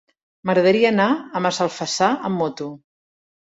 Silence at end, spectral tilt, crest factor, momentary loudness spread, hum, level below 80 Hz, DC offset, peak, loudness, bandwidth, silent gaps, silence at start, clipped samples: 0.65 s; -4.5 dB/octave; 18 dB; 12 LU; none; -64 dBFS; under 0.1%; -4 dBFS; -20 LUFS; 8 kHz; none; 0.45 s; under 0.1%